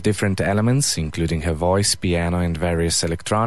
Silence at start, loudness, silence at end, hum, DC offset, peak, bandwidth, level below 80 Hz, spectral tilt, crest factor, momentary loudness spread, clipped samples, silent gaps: 0 s; -20 LUFS; 0 s; none; 1%; -6 dBFS; 12.5 kHz; -32 dBFS; -4.5 dB/octave; 14 dB; 4 LU; under 0.1%; none